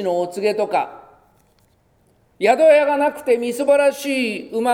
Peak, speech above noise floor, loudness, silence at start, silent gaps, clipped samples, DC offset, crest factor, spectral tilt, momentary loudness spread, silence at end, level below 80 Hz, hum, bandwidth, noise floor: -2 dBFS; 42 dB; -18 LUFS; 0 s; none; under 0.1%; under 0.1%; 18 dB; -4 dB/octave; 9 LU; 0 s; -66 dBFS; none; 17 kHz; -59 dBFS